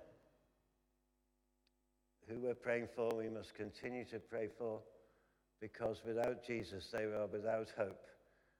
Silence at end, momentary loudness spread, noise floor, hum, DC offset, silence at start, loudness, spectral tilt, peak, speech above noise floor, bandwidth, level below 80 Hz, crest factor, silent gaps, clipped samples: 0.45 s; 9 LU; -83 dBFS; none; under 0.1%; 0 s; -44 LUFS; -6 dB/octave; -24 dBFS; 39 dB; 16 kHz; -76 dBFS; 20 dB; none; under 0.1%